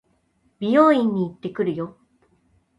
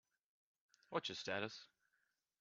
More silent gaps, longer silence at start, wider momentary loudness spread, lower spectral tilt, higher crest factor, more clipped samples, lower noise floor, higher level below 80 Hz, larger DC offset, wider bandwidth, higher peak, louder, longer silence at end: neither; second, 0.6 s vs 0.9 s; first, 15 LU vs 6 LU; first, -8 dB/octave vs -1.5 dB/octave; second, 18 dB vs 24 dB; neither; second, -65 dBFS vs -86 dBFS; first, -66 dBFS vs -88 dBFS; neither; first, 11.5 kHz vs 7.6 kHz; first, -4 dBFS vs -26 dBFS; first, -21 LUFS vs -45 LUFS; first, 0.9 s vs 0.75 s